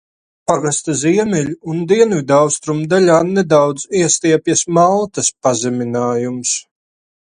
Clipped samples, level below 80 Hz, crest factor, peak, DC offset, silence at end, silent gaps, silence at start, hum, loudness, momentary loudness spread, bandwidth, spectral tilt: under 0.1%; -56 dBFS; 14 dB; 0 dBFS; under 0.1%; 0.6 s; none; 0.5 s; none; -15 LUFS; 7 LU; 11.5 kHz; -4.5 dB/octave